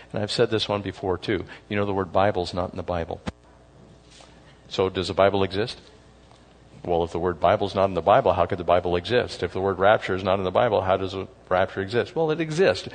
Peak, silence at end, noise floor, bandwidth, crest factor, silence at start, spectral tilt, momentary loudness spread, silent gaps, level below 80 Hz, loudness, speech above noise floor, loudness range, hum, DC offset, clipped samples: -4 dBFS; 0 s; -52 dBFS; 9.6 kHz; 20 dB; 0 s; -6 dB/octave; 9 LU; none; -54 dBFS; -24 LUFS; 28 dB; 6 LU; none; under 0.1%; under 0.1%